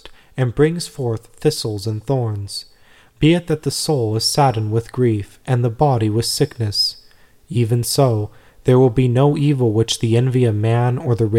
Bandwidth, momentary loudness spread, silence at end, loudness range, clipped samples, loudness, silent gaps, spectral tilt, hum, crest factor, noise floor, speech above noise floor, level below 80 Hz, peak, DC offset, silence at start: 16 kHz; 9 LU; 0 s; 4 LU; under 0.1%; -18 LUFS; none; -6 dB/octave; none; 16 dB; -49 dBFS; 32 dB; -44 dBFS; -2 dBFS; 0.1%; 0.05 s